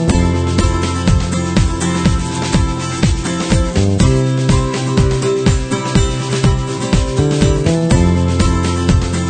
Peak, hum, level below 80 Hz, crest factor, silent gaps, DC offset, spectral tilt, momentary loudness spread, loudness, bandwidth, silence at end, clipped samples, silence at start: 0 dBFS; none; -20 dBFS; 14 dB; none; under 0.1%; -6 dB/octave; 3 LU; -15 LUFS; 9.4 kHz; 0 s; under 0.1%; 0 s